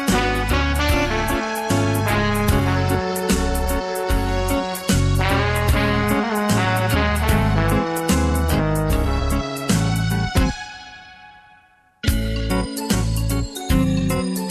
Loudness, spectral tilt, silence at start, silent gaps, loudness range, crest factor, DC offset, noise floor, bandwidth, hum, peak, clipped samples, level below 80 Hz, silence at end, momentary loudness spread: -20 LUFS; -5.5 dB/octave; 0 s; none; 5 LU; 14 dB; under 0.1%; -54 dBFS; 14 kHz; none; -4 dBFS; under 0.1%; -26 dBFS; 0 s; 5 LU